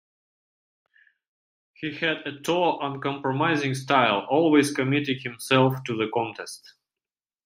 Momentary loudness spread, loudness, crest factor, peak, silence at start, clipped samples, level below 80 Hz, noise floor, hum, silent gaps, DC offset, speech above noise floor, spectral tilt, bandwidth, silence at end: 12 LU; -24 LUFS; 22 dB; -4 dBFS; 1.8 s; under 0.1%; -70 dBFS; under -90 dBFS; none; none; under 0.1%; over 66 dB; -5 dB/octave; 15.5 kHz; 0.9 s